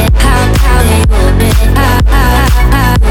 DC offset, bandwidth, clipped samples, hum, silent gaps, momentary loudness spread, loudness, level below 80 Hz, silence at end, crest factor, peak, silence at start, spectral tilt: under 0.1%; 17 kHz; 0.2%; none; none; 1 LU; -9 LUFS; -8 dBFS; 0 s; 6 dB; 0 dBFS; 0 s; -5.5 dB/octave